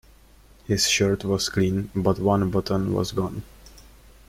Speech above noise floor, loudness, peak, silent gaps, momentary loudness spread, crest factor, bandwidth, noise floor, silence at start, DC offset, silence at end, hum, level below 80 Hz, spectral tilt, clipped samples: 29 dB; -23 LUFS; -8 dBFS; none; 8 LU; 18 dB; 16 kHz; -52 dBFS; 0.7 s; under 0.1%; 0.6 s; none; -46 dBFS; -4.5 dB/octave; under 0.1%